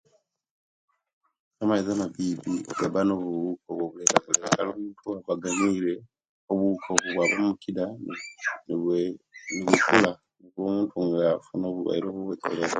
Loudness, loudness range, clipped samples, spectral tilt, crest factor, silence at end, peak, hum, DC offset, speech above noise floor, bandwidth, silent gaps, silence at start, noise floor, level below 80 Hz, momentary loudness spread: -26 LUFS; 3 LU; under 0.1%; -4 dB/octave; 28 dB; 0 s; 0 dBFS; none; under 0.1%; 42 dB; 11 kHz; 6.29-6.48 s; 1.6 s; -68 dBFS; -66 dBFS; 11 LU